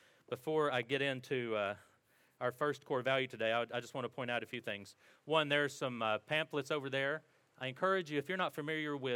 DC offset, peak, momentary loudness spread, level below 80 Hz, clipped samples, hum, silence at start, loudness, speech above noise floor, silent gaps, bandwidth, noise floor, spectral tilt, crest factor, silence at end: under 0.1%; -18 dBFS; 10 LU; -88 dBFS; under 0.1%; none; 0.3 s; -37 LUFS; 35 dB; none; 17 kHz; -72 dBFS; -5 dB/octave; 20 dB; 0 s